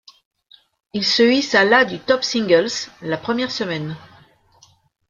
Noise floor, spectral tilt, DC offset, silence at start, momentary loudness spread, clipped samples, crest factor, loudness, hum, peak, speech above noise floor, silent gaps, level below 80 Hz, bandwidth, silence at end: -55 dBFS; -3.5 dB/octave; under 0.1%; 0.95 s; 13 LU; under 0.1%; 18 dB; -18 LUFS; none; -2 dBFS; 36 dB; none; -62 dBFS; 7.6 kHz; 1.05 s